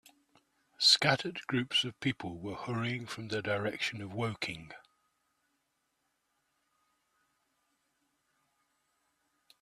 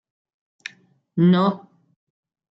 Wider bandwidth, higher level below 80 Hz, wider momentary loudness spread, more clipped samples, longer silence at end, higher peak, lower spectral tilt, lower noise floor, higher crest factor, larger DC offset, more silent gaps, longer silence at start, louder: first, 14 kHz vs 6.2 kHz; about the same, -72 dBFS vs -68 dBFS; second, 15 LU vs 22 LU; neither; first, 4.85 s vs 0.95 s; about the same, -10 dBFS vs -8 dBFS; second, -3.5 dB/octave vs -8.5 dB/octave; first, -80 dBFS vs -55 dBFS; first, 28 dB vs 16 dB; neither; neither; second, 0.8 s vs 1.15 s; second, -31 LUFS vs -19 LUFS